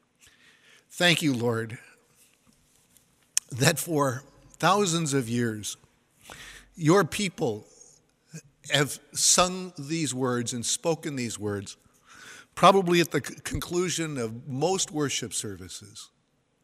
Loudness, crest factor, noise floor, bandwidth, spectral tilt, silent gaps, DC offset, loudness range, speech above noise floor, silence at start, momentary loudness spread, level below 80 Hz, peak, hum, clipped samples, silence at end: -26 LUFS; 26 dB; -70 dBFS; 16 kHz; -3.5 dB/octave; none; under 0.1%; 4 LU; 44 dB; 0.9 s; 22 LU; -58 dBFS; -2 dBFS; none; under 0.1%; 0.6 s